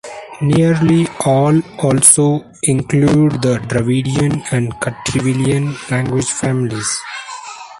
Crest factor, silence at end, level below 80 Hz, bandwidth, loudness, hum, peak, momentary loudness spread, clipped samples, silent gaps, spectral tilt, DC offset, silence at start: 14 dB; 0 s; -44 dBFS; 14.5 kHz; -14 LUFS; none; 0 dBFS; 10 LU; under 0.1%; none; -5 dB/octave; under 0.1%; 0.05 s